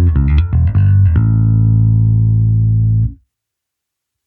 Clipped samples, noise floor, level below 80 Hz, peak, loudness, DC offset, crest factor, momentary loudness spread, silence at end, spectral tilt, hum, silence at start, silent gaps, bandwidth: under 0.1%; -79 dBFS; -20 dBFS; -2 dBFS; -12 LUFS; under 0.1%; 10 dB; 3 LU; 1.15 s; -12 dB/octave; none; 0 s; none; 3.5 kHz